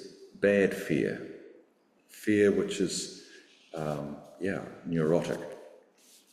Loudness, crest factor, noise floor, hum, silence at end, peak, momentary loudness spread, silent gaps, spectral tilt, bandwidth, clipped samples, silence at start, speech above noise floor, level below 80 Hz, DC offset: -30 LUFS; 18 dB; -66 dBFS; none; 0.65 s; -12 dBFS; 20 LU; none; -5.5 dB/octave; 15 kHz; under 0.1%; 0 s; 37 dB; -66 dBFS; under 0.1%